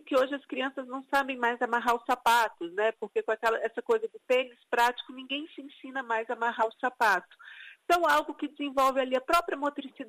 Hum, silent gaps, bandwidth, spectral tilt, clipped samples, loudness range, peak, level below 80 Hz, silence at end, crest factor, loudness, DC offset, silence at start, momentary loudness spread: none; none; 15.5 kHz; -2 dB/octave; under 0.1%; 2 LU; -12 dBFS; -66 dBFS; 0 s; 16 dB; -29 LUFS; under 0.1%; 0.05 s; 12 LU